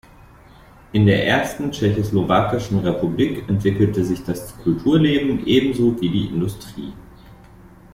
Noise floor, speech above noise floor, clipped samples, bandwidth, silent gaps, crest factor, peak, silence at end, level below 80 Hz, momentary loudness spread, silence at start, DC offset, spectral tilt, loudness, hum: -46 dBFS; 27 dB; under 0.1%; 16 kHz; none; 16 dB; -4 dBFS; 0.6 s; -42 dBFS; 9 LU; 0.95 s; under 0.1%; -7 dB/octave; -19 LUFS; none